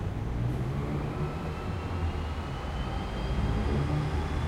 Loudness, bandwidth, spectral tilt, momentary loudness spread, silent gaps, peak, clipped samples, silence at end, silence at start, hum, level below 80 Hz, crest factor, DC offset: -32 LUFS; 12.5 kHz; -7.5 dB/octave; 5 LU; none; -18 dBFS; under 0.1%; 0 s; 0 s; none; -36 dBFS; 14 dB; under 0.1%